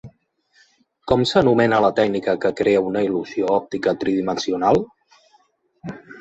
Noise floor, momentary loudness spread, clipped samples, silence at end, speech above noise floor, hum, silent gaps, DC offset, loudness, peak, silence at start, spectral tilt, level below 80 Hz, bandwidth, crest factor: -61 dBFS; 20 LU; under 0.1%; 0 s; 43 dB; none; none; under 0.1%; -19 LUFS; -2 dBFS; 0.05 s; -6 dB/octave; -52 dBFS; 8.2 kHz; 20 dB